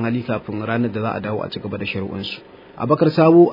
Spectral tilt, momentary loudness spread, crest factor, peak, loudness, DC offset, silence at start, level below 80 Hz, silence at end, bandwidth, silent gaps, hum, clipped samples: -9.5 dB/octave; 15 LU; 18 dB; -2 dBFS; -20 LUFS; under 0.1%; 0 s; -56 dBFS; 0 s; 5.4 kHz; none; none; under 0.1%